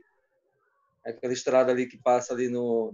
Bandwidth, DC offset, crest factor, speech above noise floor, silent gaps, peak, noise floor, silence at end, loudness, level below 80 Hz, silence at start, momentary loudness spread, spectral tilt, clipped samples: 7.8 kHz; under 0.1%; 18 dB; 47 dB; none; -10 dBFS; -72 dBFS; 0 s; -26 LUFS; -80 dBFS; 1.05 s; 13 LU; -4.5 dB/octave; under 0.1%